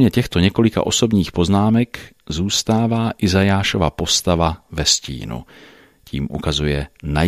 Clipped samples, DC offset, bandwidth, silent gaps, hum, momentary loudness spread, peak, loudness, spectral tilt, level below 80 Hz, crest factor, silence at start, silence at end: under 0.1%; under 0.1%; 15 kHz; none; none; 12 LU; 0 dBFS; -18 LUFS; -4.5 dB/octave; -34 dBFS; 18 dB; 0 s; 0 s